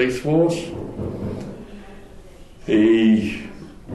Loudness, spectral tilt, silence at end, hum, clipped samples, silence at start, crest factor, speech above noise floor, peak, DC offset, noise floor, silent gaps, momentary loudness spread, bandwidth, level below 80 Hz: -20 LUFS; -7 dB/octave; 0 s; none; under 0.1%; 0 s; 14 dB; 23 dB; -6 dBFS; under 0.1%; -41 dBFS; none; 23 LU; 12 kHz; -44 dBFS